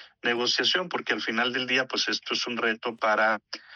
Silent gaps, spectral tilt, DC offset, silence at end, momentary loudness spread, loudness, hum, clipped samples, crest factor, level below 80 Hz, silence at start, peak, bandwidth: none; -2 dB/octave; under 0.1%; 0 s; 5 LU; -26 LUFS; none; under 0.1%; 18 dB; -78 dBFS; 0 s; -10 dBFS; 9.6 kHz